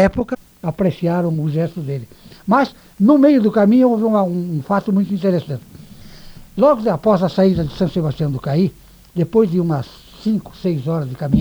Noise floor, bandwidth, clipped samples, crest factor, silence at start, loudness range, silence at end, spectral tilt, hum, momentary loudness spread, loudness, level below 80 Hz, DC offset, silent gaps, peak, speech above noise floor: -38 dBFS; over 20 kHz; under 0.1%; 14 dB; 0 s; 4 LU; 0 s; -9 dB/octave; none; 13 LU; -17 LUFS; -44 dBFS; under 0.1%; none; -2 dBFS; 22 dB